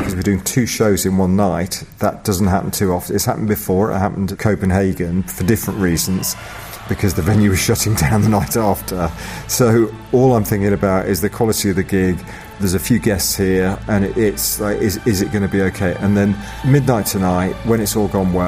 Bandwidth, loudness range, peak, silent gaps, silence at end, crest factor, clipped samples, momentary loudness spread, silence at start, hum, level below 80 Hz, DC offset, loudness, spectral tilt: 15.5 kHz; 2 LU; -2 dBFS; none; 0 s; 14 dB; under 0.1%; 6 LU; 0 s; none; -36 dBFS; under 0.1%; -17 LUFS; -5.5 dB/octave